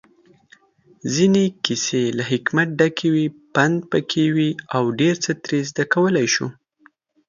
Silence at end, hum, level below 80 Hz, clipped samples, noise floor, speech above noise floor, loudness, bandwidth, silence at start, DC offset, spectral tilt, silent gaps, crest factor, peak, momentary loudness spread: 0.75 s; none; -62 dBFS; under 0.1%; -57 dBFS; 37 dB; -20 LUFS; 7.4 kHz; 1.05 s; under 0.1%; -4.5 dB/octave; none; 20 dB; 0 dBFS; 5 LU